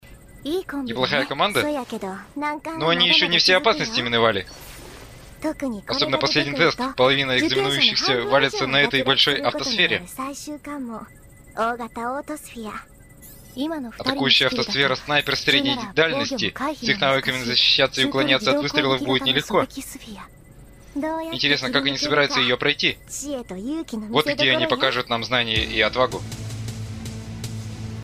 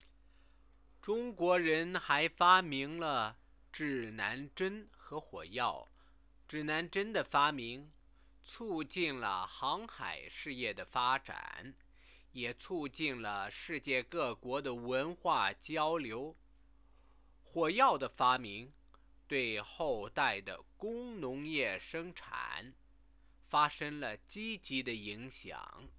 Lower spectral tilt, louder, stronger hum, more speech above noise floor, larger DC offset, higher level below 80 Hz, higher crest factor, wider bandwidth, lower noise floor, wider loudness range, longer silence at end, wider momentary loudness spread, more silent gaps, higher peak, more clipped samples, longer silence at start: first, -3.5 dB/octave vs -2 dB/octave; first, -20 LUFS vs -36 LUFS; neither; second, 24 dB vs 29 dB; neither; first, -48 dBFS vs -66 dBFS; second, 18 dB vs 26 dB; first, 15.5 kHz vs 4 kHz; second, -46 dBFS vs -66 dBFS; about the same, 5 LU vs 7 LU; about the same, 0 s vs 0.1 s; about the same, 16 LU vs 16 LU; neither; first, -4 dBFS vs -12 dBFS; neither; second, 0.05 s vs 1.05 s